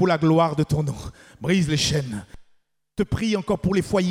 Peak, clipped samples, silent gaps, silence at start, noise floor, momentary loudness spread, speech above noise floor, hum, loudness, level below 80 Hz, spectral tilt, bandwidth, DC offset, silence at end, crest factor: -6 dBFS; under 0.1%; none; 0 s; -61 dBFS; 16 LU; 39 dB; none; -22 LUFS; -44 dBFS; -5.5 dB/octave; 15.5 kHz; under 0.1%; 0 s; 16 dB